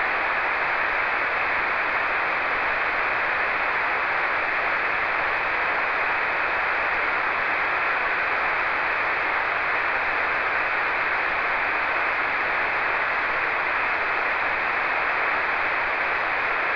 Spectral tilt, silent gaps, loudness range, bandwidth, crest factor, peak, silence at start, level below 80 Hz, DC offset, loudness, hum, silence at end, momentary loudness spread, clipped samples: -4 dB/octave; none; 0 LU; 5.4 kHz; 12 dB; -10 dBFS; 0 s; -52 dBFS; under 0.1%; -22 LUFS; none; 0 s; 0 LU; under 0.1%